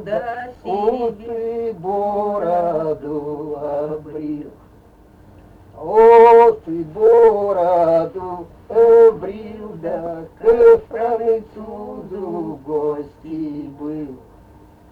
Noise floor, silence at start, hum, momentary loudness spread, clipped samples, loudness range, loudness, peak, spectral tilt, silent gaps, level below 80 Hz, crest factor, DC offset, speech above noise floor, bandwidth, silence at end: -47 dBFS; 0 s; none; 20 LU; under 0.1%; 12 LU; -16 LUFS; 0 dBFS; -8 dB/octave; none; -48 dBFS; 16 dB; under 0.1%; 31 dB; 4.6 kHz; 0.75 s